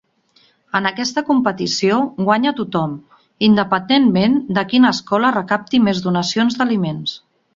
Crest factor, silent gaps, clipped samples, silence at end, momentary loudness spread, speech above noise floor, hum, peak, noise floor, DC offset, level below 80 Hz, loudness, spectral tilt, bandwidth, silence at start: 16 dB; none; under 0.1%; 0.4 s; 8 LU; 40 dB; none; -2 dBFS; -56 dBFS; under 0.1%; -56 dBFS; -17 LUFS; -5 dB/octave; 7.6 kHz; 0.75 s